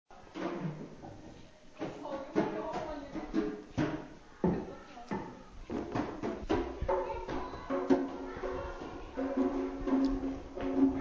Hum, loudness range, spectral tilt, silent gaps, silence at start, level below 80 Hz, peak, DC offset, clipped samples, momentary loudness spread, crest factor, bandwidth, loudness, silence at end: none; 4 LU; -7.5 dB/octave; none; 0.1 s; -50 dBFS; -16 dBFS; under 0.1%; under 0.1%; 17 LU; 20 dB; 7.4 kHz; -36 LUFS; 0 s